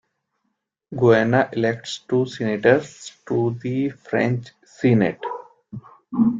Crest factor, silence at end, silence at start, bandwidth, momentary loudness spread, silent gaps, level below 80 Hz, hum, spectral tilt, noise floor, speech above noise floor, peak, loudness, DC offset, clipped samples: 18 dB; 0 s; 0.9 s; 7.8 kHz; 20 LU; none; -60 dBFS; none; -7 dB/octave; -76 dBFS; 55 dB; -2 dBFS; -21 LUFS; under 0.1%; under 0.1%